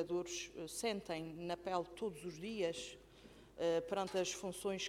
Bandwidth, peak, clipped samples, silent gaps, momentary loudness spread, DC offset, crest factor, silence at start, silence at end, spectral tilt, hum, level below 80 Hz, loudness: 16.5 kHz; -24 dBFS; under 0.1%; none; 11 LU; under 0.1%; 18 dB; 0 s; 0 s; -3.5 dB/octave; none; -70 dBFS; -42 LUFS